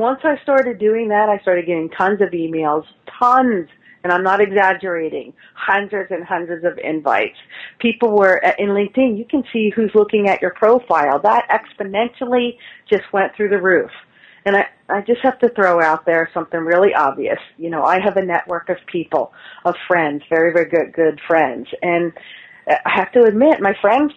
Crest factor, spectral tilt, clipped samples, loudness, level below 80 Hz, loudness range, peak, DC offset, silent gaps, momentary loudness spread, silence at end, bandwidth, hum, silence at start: 16 dB; -7 dB/octave; under 0.1%; -17 LUFS; -60 dBFS; 3 LU; -2 dBFS; under 0.1%; none; 9 LU; 0.05 s; 7.6 kHz; none; 0 s